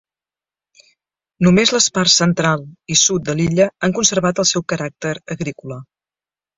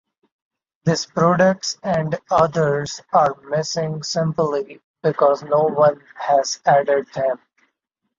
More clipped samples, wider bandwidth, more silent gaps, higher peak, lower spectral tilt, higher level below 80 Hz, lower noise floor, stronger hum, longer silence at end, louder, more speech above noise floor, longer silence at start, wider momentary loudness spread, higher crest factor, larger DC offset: neither; about the same, 8 kHz vs 7.6 kHz; second, none vs 4.84-4.94 s; about the same, 0 dBFS vs -2 dBFS; second, -3.5 dB/octave vs -5 dB/octave; first, -52 dBFS vs -58 dBFS; first, under -90 dBFS vs -76 dBFS; neither; about the same, 0.75 s vs 0.8 s; first, -16 LUFS vs -19 LUFS; first, over 73 dB vs 57 dB; first, 1.4 s vs 0.85 s; first, 13 LU vs 8 LU; about the same, 18 dB vs 18 dB; neither